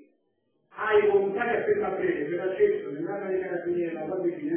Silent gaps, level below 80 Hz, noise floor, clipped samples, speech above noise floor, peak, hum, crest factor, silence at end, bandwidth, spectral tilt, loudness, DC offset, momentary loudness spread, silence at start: none; -66 dBFS; -73 dBFS; under 0.1%; 46 dB; -12 dBFS; none; 16 dB; 0 s; 3.5 kHz; -10 dB/octave; -27 LUFS; under 0.1%; 8 LU; 0 s